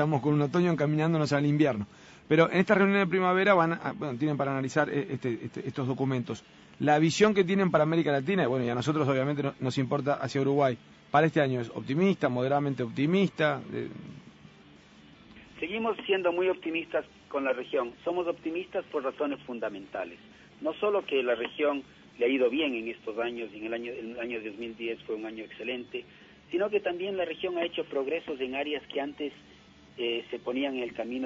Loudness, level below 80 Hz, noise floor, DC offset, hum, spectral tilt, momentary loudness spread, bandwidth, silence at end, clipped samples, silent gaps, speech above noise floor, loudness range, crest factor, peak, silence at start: -29 LUFS; -66 dBFS; -55 dBFS; under 0.1%; none; -6.5 dB/octave; 12 LU; 8 kHz; 0 s; under 0.1%; none; 26 dB; 8 LU; 20 dB; -8 dBFS; 0 s